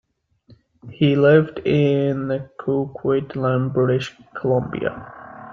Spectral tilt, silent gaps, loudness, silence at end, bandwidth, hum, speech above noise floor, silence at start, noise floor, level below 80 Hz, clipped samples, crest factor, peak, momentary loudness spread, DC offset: -8.5 dB/octave; none; -20 LUFS; 0 s; 7.4 kHz; none; 35 dB; 0.85 s; -54 dBFS; -56 dBFS; under 0.1%; 18 dB; -2 dBFS; 12 LU; under 0.1%